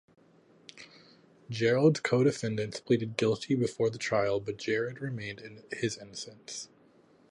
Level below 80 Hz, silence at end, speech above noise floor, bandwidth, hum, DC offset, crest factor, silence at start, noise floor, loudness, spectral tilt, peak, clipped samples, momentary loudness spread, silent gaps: -68 dBFS; 0.65 s; 32 dB; 11.5 kHz; none; under 0.1%; 20 dB; 0.75 s; -62 dBFS; -30 LUFS; -5.5 dB/octave; -12 dBFS; under 0.1%; 17 LU; none